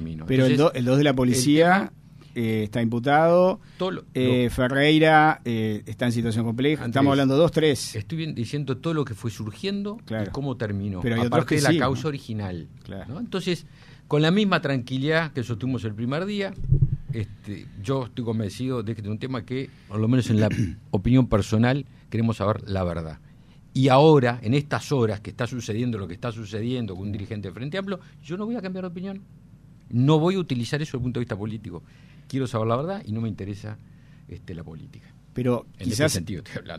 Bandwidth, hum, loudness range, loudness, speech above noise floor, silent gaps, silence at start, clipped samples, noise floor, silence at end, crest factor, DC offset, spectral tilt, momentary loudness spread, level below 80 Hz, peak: 14.5 kHz; none; 9 LU; -24 LUFS; 26 dB; none; 0 s; under 0.1%; -49 dBFS; 0 s; 18 dB; under 0.1%; -6 dB/octave; 15 LU; -44 dBFS; -4 dBFS